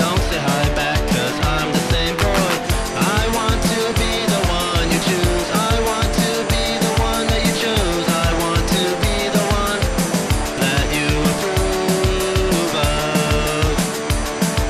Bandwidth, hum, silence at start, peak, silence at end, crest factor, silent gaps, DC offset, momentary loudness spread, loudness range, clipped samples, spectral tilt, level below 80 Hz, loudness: 15.5 kHz; none; 0 s; -6 dBFS; 0 s; 12 dB; none; under 0.1%; 2 LU; 0 LU; under 0.1%; -4 dB/octave; -26 dBFS; -18 LUFS